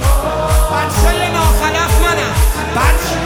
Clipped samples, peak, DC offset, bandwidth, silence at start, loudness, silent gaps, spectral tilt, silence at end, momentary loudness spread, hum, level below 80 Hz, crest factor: under 0.1%; 0 dBFS; under 0.1%; 17 kHz; 0 s; -14 LUFS; none; -4.5 dB/octave; 0 s; 2 LU; none; -16 dBFS; 12 dB